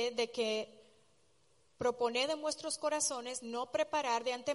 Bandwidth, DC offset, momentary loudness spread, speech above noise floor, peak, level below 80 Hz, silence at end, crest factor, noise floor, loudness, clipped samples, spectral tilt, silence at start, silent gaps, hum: 11.5 kHz; under 0.1%; 7 LU; 37 dB; -20 dBFS; -76 dBFS; 0 s; 16 dB; -73 dBFS; -35 LUFS; under 0.1%; -1.5 dB/octave; 0 s; none; none